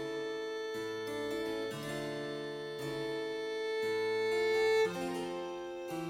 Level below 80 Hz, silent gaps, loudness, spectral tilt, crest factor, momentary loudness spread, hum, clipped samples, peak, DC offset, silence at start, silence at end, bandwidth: -70 dBFS; none; -36 LUFS; -4.5 dB/octave; 14 dB; 10 LU; none; under 0.1%; -22 dBFS; under 0.1%; 0 s; 0 s; 16.5 kHz